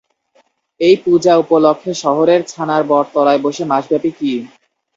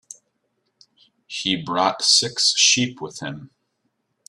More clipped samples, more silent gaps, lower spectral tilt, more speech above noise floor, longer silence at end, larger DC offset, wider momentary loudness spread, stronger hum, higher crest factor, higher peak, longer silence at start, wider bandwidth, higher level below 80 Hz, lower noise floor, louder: neither; neither; first, -5.5 dB/octave vs -1.5 dB/octave; second, 44 dB vs 52 dB; second, 0.5 s vs 0.85 s; neither; second, 7 LU vs 18 LU; neither; second, 14 dB vs 20 dB; about the same, 0 dBFS vs -2 dBFS; second, 0.8 s vs 1.3 s; second, 7.8 kHz vs 14 kHz; about the same, -60 dBFS vs -64 dBFS; second, -57 dBFS vs -73 dBFS; first, -14 LUFS vs -17 LUFS